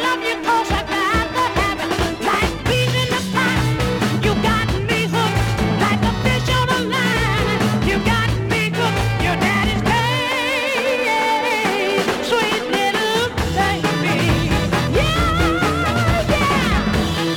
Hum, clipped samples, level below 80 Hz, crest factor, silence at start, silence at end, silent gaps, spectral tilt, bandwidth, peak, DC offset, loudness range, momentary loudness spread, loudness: none; under 0.1%; -30 dBFS; 14 dB; 0 s; 0 s; none; -5 dB/octave; 18.5 kHz; -4 dBFS; under 0.1%; 1 LU; 2 LU; -18 LUFS